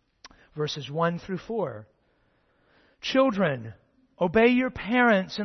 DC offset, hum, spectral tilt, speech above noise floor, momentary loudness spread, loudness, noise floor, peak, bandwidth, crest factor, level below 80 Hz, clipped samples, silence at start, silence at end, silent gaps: under 0.1%; none; -6 dB/octave; 43 dB; 14 LU; -25 LUFS; -67 dBFS; -8 dBFS; 6.4 kHz; 18 dB; -58 dBFS; under 0.1%; 0.25 s; 0 s; none